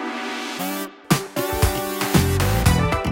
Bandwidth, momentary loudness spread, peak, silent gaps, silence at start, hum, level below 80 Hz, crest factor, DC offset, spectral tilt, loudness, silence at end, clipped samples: 17 kHz; 9 LU; -2 dBFS; none; 0 s; none; -30 dBFS; 20 dB; under 0.1%; -5 dB/octave; -21 LUFS; 0 s; under 0.1%